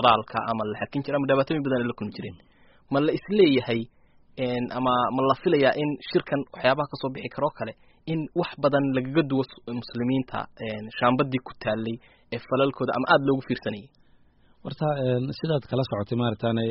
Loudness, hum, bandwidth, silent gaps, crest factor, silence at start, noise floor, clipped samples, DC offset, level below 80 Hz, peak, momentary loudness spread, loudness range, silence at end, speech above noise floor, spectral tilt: -26 LUFS; none; 5.8 kHz; none; 22 dB; 0 s; -57 dBFS; under 0.1%; under 0.1%; -58 dBFS; -4 dBFS; 13 LU; 3 LU; 0 s; 32 dB; -5 dB/octave